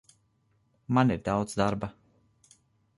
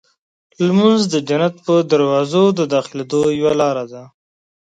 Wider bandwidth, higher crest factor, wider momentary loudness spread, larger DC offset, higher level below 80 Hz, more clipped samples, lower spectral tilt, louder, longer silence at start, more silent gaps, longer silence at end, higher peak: first, 11.5 kHz vs 9.4 kHz; about the same, 20 dB vs 16 dB; first, 10 LU vs 7 LU; neither; about the same, -54 dBFS vs -58 dBFS; neither; about the same, -6.5 dB/octave vs -6 dB/octave; second, -28 LUFS vs -16 LUFS; first, 0.9 s vs 0.6 s; neither; first, 1.05 s vs 0.6 s; second, -10 dBFS vs 0 dBFS